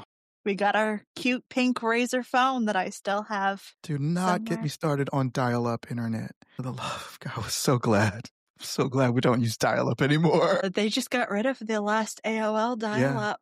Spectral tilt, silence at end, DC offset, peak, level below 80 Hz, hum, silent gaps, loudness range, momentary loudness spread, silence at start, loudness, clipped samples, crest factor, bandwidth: -5.5 dB/octave; 0.05 s; under 0.1%; -10 dBFS; -64 dBFS; none; 0.05-0.44 s, 1.07-1.15 s, 6.36-6.41 s, 8.31-8.54 s; 4 LU; 11 LU; 0 s; -27 LUFS; under 0.1%; 16 dB; 15 kHz